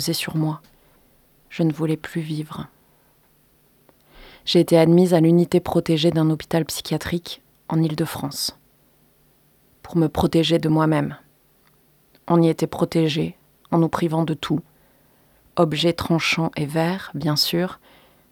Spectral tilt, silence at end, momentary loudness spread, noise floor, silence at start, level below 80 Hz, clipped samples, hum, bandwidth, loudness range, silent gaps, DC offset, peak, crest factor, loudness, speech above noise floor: -6 dB/octave; 0.55 s; 13 LU; -59 dBFS; 0 s; -52 dBFS; under 0.1%; none; 19 kHz; 9 LU; none; under 0.1%; -4 dBFS; 18 dB; -21 LUFS; 39 dB